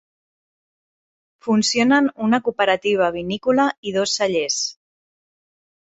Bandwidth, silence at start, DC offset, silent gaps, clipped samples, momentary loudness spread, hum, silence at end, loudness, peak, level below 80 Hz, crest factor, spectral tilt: 8.4 kHz; 1.45 s; under 0.1%; 3.77-3.83 s; under 0.1%; 6 LU; none; 1.2 s; -19 LUFS; -4 dBFS; -60 dBFS; 18 dB; -3.5 dB/octave